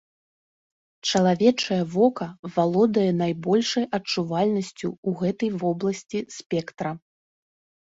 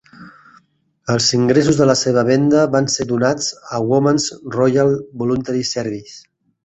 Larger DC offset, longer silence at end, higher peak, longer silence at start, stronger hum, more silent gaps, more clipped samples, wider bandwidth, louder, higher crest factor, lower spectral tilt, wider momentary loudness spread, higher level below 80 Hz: neither; first, 0.95 s vs 0.45 s; second, -6 dBFS vs -2 dBFS; first, 1.05 s vs 0.2 s; neither; first, 2.39-2.43 s, 4.98-5.03 s, 6.46-6.50 s vs none; neither; about the same, 8 kHz vs 8.2 kHz; second, -24 LUFS vs -16 LUFS; about the same, 20 dB vs 16 dB; about the same, -5.5 dB/octave vs -5 dB/octave; first, 11 LU vs 8 LU; second, -64 dBFS vs -52 dBFS